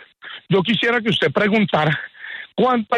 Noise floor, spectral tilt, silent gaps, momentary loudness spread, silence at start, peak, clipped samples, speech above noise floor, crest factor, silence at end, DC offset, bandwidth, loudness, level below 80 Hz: -39 dBFS; -6.5 dB/octave; none; 15 LU; 0.25 s; -6 dBFS; under 0.1%; 22 dB; 14 dB; 0 s; under 0.1%; 10 kHz; -18 LUFS; -58 dBFS